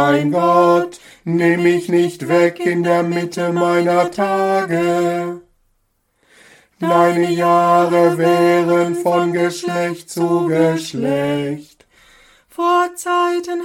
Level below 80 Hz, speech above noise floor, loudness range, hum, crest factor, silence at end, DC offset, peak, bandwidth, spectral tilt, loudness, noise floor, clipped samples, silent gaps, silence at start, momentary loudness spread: -62 dBFS; 49 dB; 4 LU; none; 14 dB; 0 s; under 0.1%; -2 dBFS; 16 kHz; -6 dB/octave; -16 LUFS; -65 dBFS; under 0.1%; none; 0 s; 9 LU